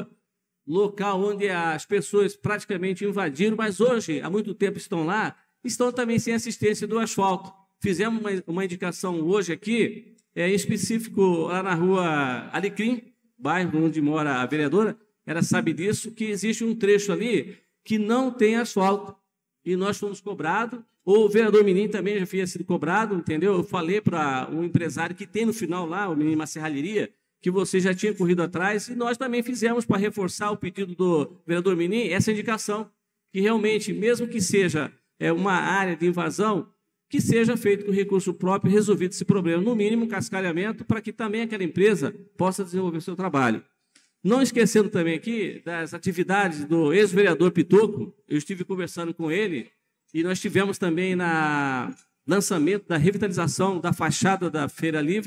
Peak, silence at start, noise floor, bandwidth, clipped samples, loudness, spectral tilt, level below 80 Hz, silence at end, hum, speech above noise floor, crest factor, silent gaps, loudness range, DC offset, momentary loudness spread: -6 dBFS; 0 s; -77 dBFS; 15.5 kHz; under 0.1%; -24 LUFS; -5.5 dB/octave; -70 dBFS; 0 s; none; 53 dB; 18 dB; none; 3 LU; under 0.1%; 8 LU